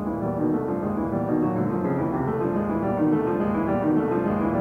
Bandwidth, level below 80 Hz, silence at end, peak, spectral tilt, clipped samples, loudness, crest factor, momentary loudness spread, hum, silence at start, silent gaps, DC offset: 3.6 kHz; -48 dBFS; 0 s; -12 dBFS; -10.5 dB/octave; under 0.1%; -24 LUFS; 12 dB; 3 LU; none; 0 s; none; under 0.1%